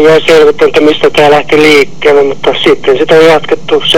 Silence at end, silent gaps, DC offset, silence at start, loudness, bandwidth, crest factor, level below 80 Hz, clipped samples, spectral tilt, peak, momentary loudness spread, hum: 0 s; none; 10%; 0 s; -6 LUFS; 16 kHz; 6 dB; -38 dBFS; 9%; -4.5 dB/octave; 0 dBFS; 5 LU; none